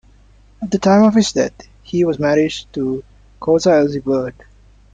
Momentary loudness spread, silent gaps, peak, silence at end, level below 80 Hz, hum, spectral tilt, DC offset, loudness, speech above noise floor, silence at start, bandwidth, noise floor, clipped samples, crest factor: 13 LU; none; -2 dBFS; 0.6 s; -46 dBFS; none; -5.5 dB/octave; under 0.1%; -16 LUFS; 33 dB; 0.6 s; 9.2 kHz; -48 dBFS; under 0.1%; 16 dB